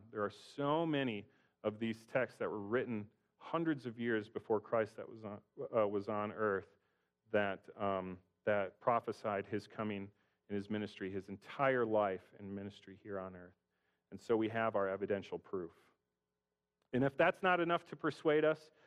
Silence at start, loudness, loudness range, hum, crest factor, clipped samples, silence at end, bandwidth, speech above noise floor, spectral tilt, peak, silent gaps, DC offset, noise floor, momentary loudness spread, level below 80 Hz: 0.05 s; -38 LUFS; 3 LU; none; 20 dB; under 0.1%; 0.3 s; 11.5 kHz; over 52 dB; -7 dB/octave; -18 dBFS; none; under 0.1%; under -90 dBFS; 15 LU; -78 dBFS